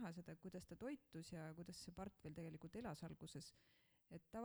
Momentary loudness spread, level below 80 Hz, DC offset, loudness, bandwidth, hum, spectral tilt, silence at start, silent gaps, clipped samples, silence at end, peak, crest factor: 5 LU; -76 dBFS; under 0.1%; -56 LUFS; over 20 kHz; none; -5.5 dB/octave; 0 s; none; under 0.1%; 0 s; -40 dBFS; 16 dB